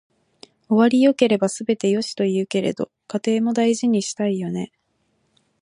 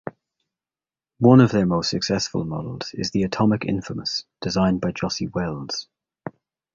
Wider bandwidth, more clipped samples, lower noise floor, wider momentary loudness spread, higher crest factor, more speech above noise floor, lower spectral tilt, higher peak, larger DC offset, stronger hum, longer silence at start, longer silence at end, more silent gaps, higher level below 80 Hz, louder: first, 11.5 kHz vs 7.6 kHz; neither; second, -68 dBFS vs under -90 dBFS; second, 11 LU vs 16 LU; about the same, 18 dB vs 20 dB; second, 49 dB vs over 69 dB; about the same, -5.5 dB/octave vs -6 dB/octave; about the same, -2 dBFS vs -2 dBFS; neither; neither; first, 0.7 s vs 0.05 s; first, 0.95 s vs 0.45 s; neither; second, -68 dBFS vs -50 dBFS; about the same, -20 LUFS vs -22 LUFS